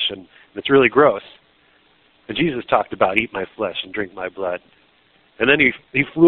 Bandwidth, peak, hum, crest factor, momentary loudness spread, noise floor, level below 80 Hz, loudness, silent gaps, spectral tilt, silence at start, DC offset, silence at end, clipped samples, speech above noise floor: 4.6 kHz; 0 dBFS; none; 20 dB; 14 LU; -57 dBFS; -54 dBFS; -19 LUFS; none; -2.5 dB/octave; 0 s; under 0.1%; 0 s; under 0.1%; 38 dB